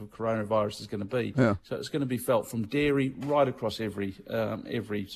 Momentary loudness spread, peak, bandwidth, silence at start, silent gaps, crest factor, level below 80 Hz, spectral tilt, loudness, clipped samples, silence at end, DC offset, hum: 7 LU; -10 dBFS; 14.5 kHz; 0 s; none; 20 dB; -58 dBFS; -6.5 dB/octave; -29 LUFS; under 0.1%; 0 s; under 0.1%; none